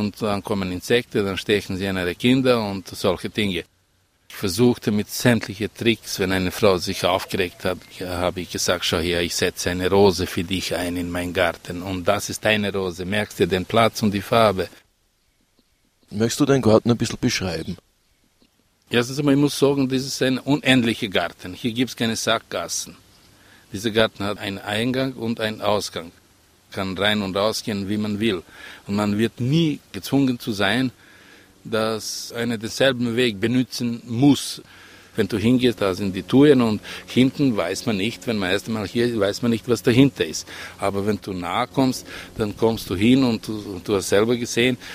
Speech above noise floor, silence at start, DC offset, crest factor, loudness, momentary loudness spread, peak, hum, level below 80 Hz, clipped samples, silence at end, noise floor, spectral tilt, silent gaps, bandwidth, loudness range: 43 dB; 0 s; under 0.1%; 22 dB; -21 LUFS; 10 LU; 0 dBFS; none; -50 dBFS; under 0.1%; 0 s; -64 dBFS; -5 dB/octave; none; 16 kHz; 4 LU